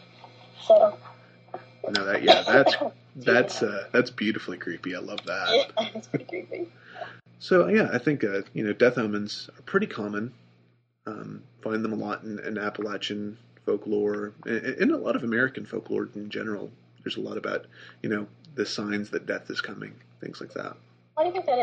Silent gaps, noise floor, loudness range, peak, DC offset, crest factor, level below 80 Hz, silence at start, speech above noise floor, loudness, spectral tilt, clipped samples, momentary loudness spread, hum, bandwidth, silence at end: none; -64 dBFS; 10 LU; -2 dBFS; under 0.1%; 24 dB; -72 dBFS; 0.25 s; 37 dB; -26 LUFS; -5 dB/octave; under 0.1%; 19 LU; none; 8.8 kHz; 0 s